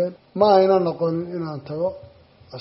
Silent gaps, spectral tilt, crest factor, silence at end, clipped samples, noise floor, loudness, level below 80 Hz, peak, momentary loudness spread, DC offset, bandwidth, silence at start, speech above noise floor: none; -6 dB/octave; 18 dB; 0 s; under 0.1%; -42 dBFS; -21 LUFS; -60 dBFS; -4 dBFS; 14 LU; under 0.1%; 6 kHz; 0 s; 22 dB